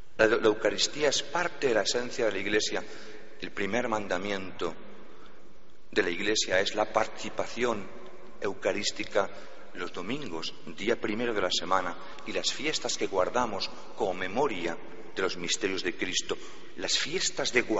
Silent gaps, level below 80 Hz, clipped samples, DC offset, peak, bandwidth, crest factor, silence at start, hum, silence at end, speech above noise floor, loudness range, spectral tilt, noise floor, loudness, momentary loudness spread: none; -60 dBFS; under 0.1%; 2%; -6 dBFS; 8 kHz; 26 dB; 0.2 s; none; 0 s; 27 dB; 4 LU; -1.5 dB/octave; -57 dBFS; -30 LUFS; 12 LU